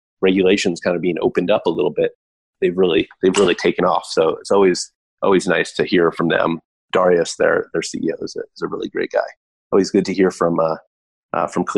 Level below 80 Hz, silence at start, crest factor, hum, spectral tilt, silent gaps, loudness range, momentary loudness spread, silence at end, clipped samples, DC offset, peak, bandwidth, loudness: -54 dBFS; 0.2 s; 14 dB; none; -5 dB/octave; 2.15-2.53 s, 4.95-5.17 s, 6.65-6.89 s, 9.37-9.71 s, 10.87-11.29 s; 3 LU; 9 LU; 0 s; under 0.1%; under 0.1%; -4 dBFS; 11.5 kHz; -18 LUFS